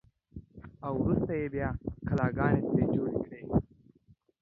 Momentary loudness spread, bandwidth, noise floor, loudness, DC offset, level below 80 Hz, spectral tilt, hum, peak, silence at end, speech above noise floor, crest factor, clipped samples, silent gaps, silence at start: 22 LU; 6.8 kHz; -65 dBFS; -31 LUFS; under 0.1%; -48 dBFS; -11 dB/octave; none; -14 dBFS; 0.8 s; 35 dB; 18 dB; under 0.1%; none; 0.35 s